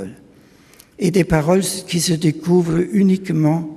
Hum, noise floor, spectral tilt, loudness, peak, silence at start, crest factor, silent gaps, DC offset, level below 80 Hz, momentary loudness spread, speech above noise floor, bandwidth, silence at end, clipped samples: none; -48 dBFS; -6 dB/octave; -17 LUFS; -2 dBFS; 0 s; 16 dB; none; under 0.1%; -42 dBFS; 4 LU; 32 dB; 15 kHz; 0 s; under 0.1%